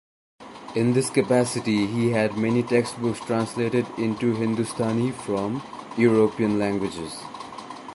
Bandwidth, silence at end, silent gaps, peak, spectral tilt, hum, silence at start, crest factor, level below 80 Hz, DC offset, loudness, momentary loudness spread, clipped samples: 11.5 kHz; 0 s; none; -6 dBFS; -6 dB/octave; none; 0.4 s; 18 dB; -58 dBFS; under 0.1%; -24 LUFS; 13 LU; under 0.1%